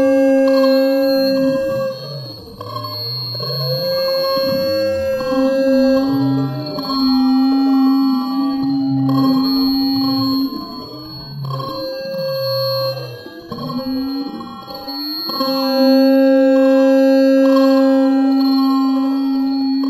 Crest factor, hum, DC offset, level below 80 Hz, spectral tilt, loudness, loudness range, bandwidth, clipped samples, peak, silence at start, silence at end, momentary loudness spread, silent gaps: 14 dB; none; under 0.1%; -52 dBFS; -6.5 dB/octave; -16 LUFS; 10 LU; 14 kHz; under 0.1%; -2 dBFS; 0 s; 0 s; 15 LU; none